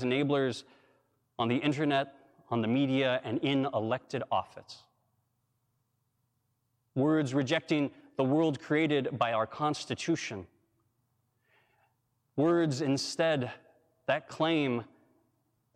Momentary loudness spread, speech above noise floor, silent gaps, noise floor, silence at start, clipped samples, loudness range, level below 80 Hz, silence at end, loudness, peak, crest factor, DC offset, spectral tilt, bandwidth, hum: 12 LU; 48 dB; none; -78 dBFS; 0 s; under 0.1%; 6 LU; -76 dBFS; 0.9 s; -31 LUFS; -14 dBFS; 18 dB; under 0.1%; -6 dB/octave; 10.5 kHz; none